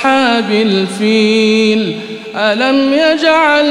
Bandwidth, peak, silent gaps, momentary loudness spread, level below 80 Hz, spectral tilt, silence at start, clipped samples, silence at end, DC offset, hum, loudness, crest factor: 11 kHz; 0 dBFS; none; 6 LU; -60 dBFS; -4.5 dB/octave; 0 s; under 0.1%; 0 s; 0.2%; none; -11 LUFS; 10 dB